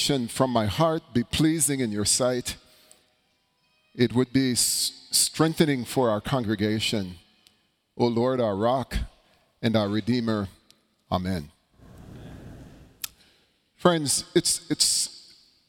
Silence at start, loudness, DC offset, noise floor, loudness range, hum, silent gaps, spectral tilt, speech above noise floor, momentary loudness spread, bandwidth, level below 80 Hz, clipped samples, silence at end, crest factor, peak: 0 s; -24 LUFS; under 0.1%; -69 dBFS; 7 LU; none; none; -4 dB/octave; 45 dB; 16 LU; 18 kHz; -48 dBFS; under 0.1%; 0.5 s; 22 dB; -4 dBFS